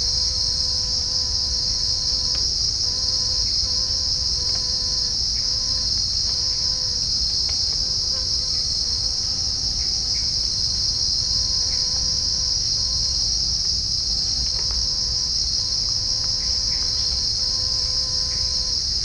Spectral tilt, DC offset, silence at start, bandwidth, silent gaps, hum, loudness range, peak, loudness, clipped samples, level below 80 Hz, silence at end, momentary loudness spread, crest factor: -1 dB/octave; under 0.1%; 0 s; 10.5 kHz; none; none; 1 LU; -8 dBFS; -19 LUFS; under 0.1%; -34 dBFS; 0 s; 1 LU; 14 dB